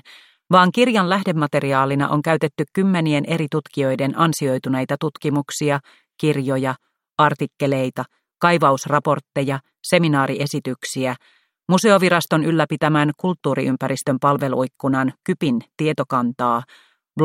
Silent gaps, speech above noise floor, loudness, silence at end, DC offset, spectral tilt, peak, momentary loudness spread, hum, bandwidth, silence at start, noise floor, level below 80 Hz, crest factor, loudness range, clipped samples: none; 29 dB; -19 LUFS; 0 s; under 0.1%; -6 dB/octave; -2 dBFS; 9 LU; none; 16.5 kHz; 0.5 s; -48 dBFS; -64 dBFS; 18 dB; 3 LU; under 0.1%